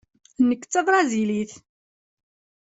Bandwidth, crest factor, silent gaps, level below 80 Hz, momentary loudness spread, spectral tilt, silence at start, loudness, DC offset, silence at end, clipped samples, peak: 8 kHz; 18 dB; none; -66 dBFS; 8 LU; -4.5 dB/octave; 0.4 s; -22 LUFS; under 0.1%; 1.05 s; under 0.1%; -6 dBFS